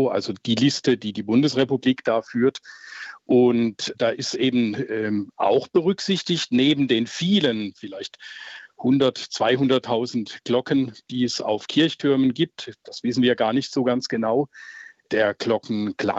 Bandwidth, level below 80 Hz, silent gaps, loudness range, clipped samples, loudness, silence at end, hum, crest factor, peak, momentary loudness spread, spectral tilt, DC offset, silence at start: 8 kHz; -68 dBFS; none; 2 LU; under 0.1%; -22 LUFS; 0 s; none; 16 dB; -6 dBFS; 15 LU; -5.5 dB/octave; under 0.1%; 0 s